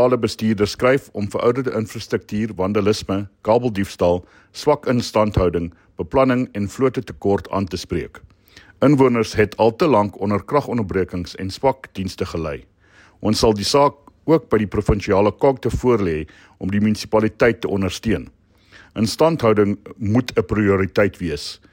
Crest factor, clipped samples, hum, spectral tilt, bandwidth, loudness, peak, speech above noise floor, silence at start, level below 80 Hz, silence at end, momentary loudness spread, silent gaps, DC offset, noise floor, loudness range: 16 dB; under 0.1%; none; -6 dB/octave; 16.5 kHz; -19 LUFS; -4 dBFS; 33 dB; 0 s; -40 dBFS; 0.2 s; 10 LU; none; under 0.1%; -51 dBFS; 3 LU